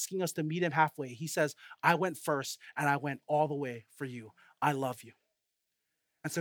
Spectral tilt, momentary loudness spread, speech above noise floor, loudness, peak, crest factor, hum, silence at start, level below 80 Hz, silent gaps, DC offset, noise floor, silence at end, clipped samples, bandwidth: -4.5 dB/octave; 13 LU; 51 dB; -33 LUFS; -10 dBFS; 24 dB; none; 0 s; -86 dBFS; none; under 0.1%; -84 dBFS; 0 s; under 0.1%; over 20 kHz